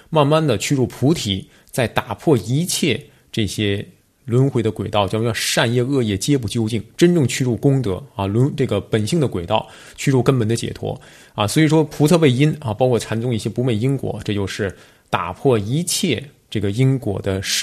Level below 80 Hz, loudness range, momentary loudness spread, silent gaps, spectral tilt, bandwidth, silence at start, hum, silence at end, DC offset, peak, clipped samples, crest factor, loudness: -50 dBFS; 3 LU; 9 LU; none; -5.5 dB/octave; 14 kHz; 0.1 s; none; 0 s; under 0.1%; 0 dBFS; under 0.1%; 18 dB; -19 LUFS